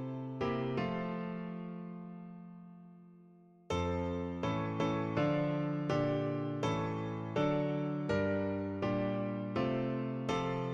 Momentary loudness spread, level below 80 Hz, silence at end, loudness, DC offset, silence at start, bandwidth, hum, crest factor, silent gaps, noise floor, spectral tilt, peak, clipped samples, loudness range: 13 LU; -60 dBFS; 0 s; -36 LUFS; under 0.1%; 0 s; 8.6 kHz; none; 16 dB; none; -60 dBFS; -7.5 dB/octave; -20 dBFS; under 0.1%; 7 LU